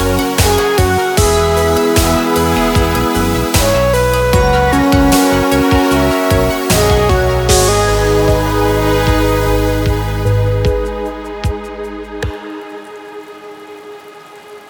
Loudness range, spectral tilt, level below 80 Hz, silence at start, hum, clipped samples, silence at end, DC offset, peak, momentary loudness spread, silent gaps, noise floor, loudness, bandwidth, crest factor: 9 LU; -5 dB/octave; -22 dBFS; 0 s; none; under 0.1%; 0.1 s; under 0.1%; 0 dBFS; 17 LU; none; -35 dBFS; -13 LUFS; over 20 kHz; 12 dB